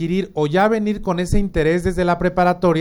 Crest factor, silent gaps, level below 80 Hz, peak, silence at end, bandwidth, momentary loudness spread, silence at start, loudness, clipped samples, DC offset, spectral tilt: 14 dB; none; -30 dBFS; -4 dBFS; 0 s; 16.5 kHz; 5 LU; 0 s; -18 LUFS; under 0.1%; under 0.1%; -7 dB/octave